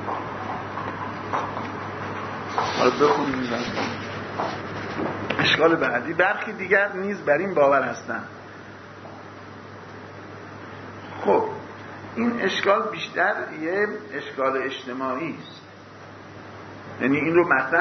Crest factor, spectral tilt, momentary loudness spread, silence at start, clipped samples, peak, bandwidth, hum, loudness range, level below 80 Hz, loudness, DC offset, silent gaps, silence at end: 20 dB; -5.5 dB/octave; 21 LU; 0 s; under 0.1%; -4 dBFS; 6.4 kHz; none; 9 LU; -60 dBFS; -24 LUFS; under 0.1%; none; 0 s